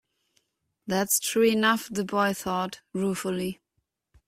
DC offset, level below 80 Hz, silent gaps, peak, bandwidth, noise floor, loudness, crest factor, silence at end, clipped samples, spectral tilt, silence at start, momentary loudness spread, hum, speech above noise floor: under 0.1%; -64 dBFS; none; -8 dBFS; 16 kHz; -78 dBFS; -26 LUFS; 18 dB; 0.75 s; under 0.1%; -3.5 dB/octave; 0.85 s; 11 LU; none; 52 dB